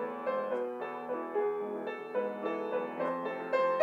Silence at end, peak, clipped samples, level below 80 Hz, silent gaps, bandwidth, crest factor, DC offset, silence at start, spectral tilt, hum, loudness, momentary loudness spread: 0 s; -14 dBFS; under 0.1%; under -90 dBFS; none; 7.4 kHz; 20 dB; under 0.1%; 0 s; -6.5 dB/octave; none; -35 LUFS; 5 LU